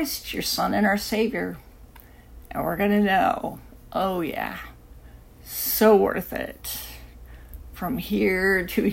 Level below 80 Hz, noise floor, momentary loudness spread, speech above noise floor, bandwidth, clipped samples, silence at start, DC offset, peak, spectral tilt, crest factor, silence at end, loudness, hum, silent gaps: -46 dBFS; -47 dBFS; 19 LU; 24 dB; 16.5 kHz; under 0.1%; 0 s; under 0.1%; -4 dBFS; -4.5 dB/octave; 20 dB; 0 s; -24 LUFS; none; none